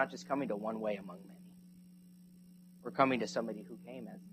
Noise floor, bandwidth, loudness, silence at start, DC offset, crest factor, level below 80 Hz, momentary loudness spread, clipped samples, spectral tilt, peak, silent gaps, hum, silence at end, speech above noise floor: -58 dBFS; 14.5 kHz; -37 LUFS; 0 s; under 0.1%; 24 dB; -78 dBFS; 27 LU; under 0.1%; -5.5 dB/octave; -14 dBFS; none; none; 0.05 s; 21 dB